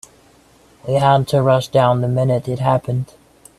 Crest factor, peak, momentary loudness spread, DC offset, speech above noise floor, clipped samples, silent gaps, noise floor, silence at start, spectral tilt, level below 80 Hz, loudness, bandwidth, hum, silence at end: 18 dB; 0 dBFS; 10 LU; under 0.1%; 35 dB; under 0.1%; none; -50 dBFS; 0.85 s; -7 dB/octave; -52 dBFS; -17 LUFS; 13 kHz; none; 0.55 s